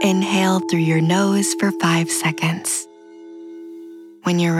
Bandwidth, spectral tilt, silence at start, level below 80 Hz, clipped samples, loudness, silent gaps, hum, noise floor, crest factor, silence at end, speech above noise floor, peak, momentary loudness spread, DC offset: 15.5 kHz; -4.5 dB/octave; 0 s; -76 dBFS; under 0.1%; -19 LUFS; none; none; -40 dBFS; 16 dB; 0 s; 22 dB; -4 dBFS; 21 LU; under 0.1%